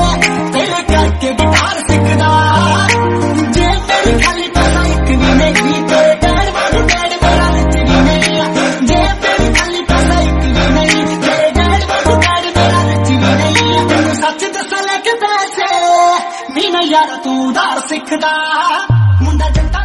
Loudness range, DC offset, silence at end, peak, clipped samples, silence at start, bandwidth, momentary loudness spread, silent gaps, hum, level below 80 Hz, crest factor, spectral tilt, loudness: 2 LU; under 0.1%; 0 s; 0 dBFS; under 0.1%; 0 s; 12 kHz; 4 LU; none; none; -20 dBFS; 10 dB; -5 dB/octave; -11 LUFS